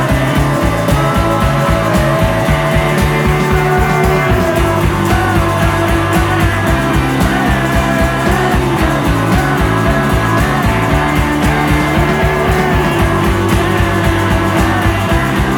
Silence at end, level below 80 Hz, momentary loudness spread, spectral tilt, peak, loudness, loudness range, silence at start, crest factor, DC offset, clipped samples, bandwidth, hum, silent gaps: 0 s; -20 dBFS; 1 LU; -6 dB/octave; 0 dBFS; -12 LUFS; 0 LU; 0 s; 12 dB; under 0.1%; under 0.1%; 20 kHz; none; none